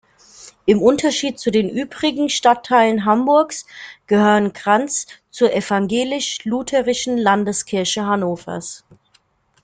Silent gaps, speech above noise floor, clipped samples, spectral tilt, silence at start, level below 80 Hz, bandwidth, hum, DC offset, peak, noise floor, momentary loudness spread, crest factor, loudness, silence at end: none; 42 dB; under 0.1%; -4 dB/octave; 0.4 s; -56 dBFS; 9.4 kHz; none; under 0.1%; -2 dBFS; -60 dBFS; 12 LU; 16 dB; -18 LUFS; 0.85 s